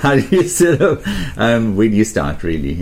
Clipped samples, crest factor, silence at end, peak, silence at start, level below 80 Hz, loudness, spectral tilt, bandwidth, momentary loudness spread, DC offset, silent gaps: under 0.1%; 14 dB; 0 s; -2 dBFS; 0 s; -32 dBFS; -15 LUFS; -5.5 dB/octave; 16.5 kHz; 8 LU; under 0.1%; none